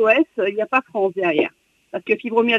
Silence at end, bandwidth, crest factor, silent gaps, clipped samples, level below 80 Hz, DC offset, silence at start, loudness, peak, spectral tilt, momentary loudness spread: 0 s; 7.4 kHz; 16 dB; none; under 0.1%; -68 dBFS; under 0.1%; 0 s; -20 LUFS; -4 dBFS; -6 dB/octave; 9 LU